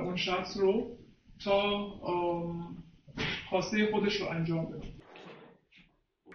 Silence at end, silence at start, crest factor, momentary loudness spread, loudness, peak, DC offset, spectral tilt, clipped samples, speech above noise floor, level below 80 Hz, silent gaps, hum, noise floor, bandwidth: 0 s; 0 s; 18 dB; 21 LU; -32 LUFS; -14 dBFS; under 0.1%; -5.5 dB/octave; under 0.1%; 34 dB; -58 dBFS; none; none; -65 dBFS; 6.8 kHz